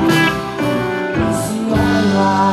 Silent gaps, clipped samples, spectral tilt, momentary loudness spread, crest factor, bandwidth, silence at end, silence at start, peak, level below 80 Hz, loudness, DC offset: none; under 0.1%; -5.5 dB/octave; 5 LU; 12 dB; 14.5 kHz; 0 s; 0 s; -2 dBFS; -36 dBFS; -16 LUFS; under 0.1%